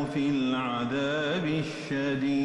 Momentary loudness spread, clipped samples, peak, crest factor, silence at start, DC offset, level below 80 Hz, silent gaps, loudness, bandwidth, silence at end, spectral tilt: 4 LU; under 0.1%; -18 dBFS; 10 dB; 0 s; under 0.1%; -62 dBFS; none; -29 LUFS; 10.5 kHz; 0 s; -6 dB/octave